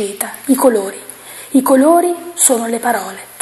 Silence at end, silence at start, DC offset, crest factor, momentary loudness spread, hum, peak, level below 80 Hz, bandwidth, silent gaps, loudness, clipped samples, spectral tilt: 0 s; 0 s; under 0.1%; 14 dB; 18 LU; none; 0 dBFS; -62 dBFS; 13 kHz; none; -13 LUFS; under 0.1%; -2.5 dB/octave